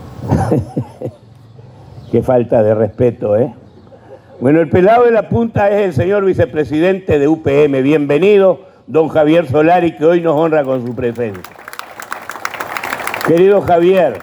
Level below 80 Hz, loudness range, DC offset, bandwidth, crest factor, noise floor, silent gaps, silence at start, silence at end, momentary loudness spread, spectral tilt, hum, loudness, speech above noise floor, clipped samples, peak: -42 dBFS; 5 LU; under 0.1%; over 20 kHz; 12 dB; -39 dBFS; none; 0 s; 0 s; 14 LU; -7.5 dB/octave; none; -13 LUFS; 28 dB; under 0.1%; 0 dBFS